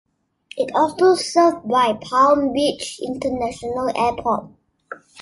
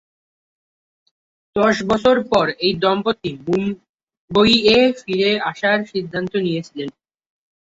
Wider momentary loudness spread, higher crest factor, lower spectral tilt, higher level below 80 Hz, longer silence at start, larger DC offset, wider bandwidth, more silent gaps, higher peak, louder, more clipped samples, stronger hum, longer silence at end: about the same, 12 LU vs 13 LU; about the same, 16 dB vs 18 dB; second, -4 dB/octave vs -5.5 dB/octave; about the same, -52 dBFS vs -52 dBFS; second, 0.55 s vs 1.55 s; neither; first, 11.5 kHz vs 8 kHz; second, none vs 3.89-4.07 s, 4.17-4.28 s; about the same, -2 dBFS vs -2 dBFS; about the same, -19 LUFS vs -18 LUFS; neither; neither; second, 0 s vs 0.75 s